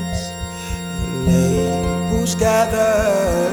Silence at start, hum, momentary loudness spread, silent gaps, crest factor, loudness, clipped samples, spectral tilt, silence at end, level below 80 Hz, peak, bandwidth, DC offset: 0 s; none; 11 LU; none; 14 dB; -18 LUFS; under 0.1%; -5.5 dB/octave; 0 s; -30 dBFS; -4 dBFS; 20 kHz; under 0.1%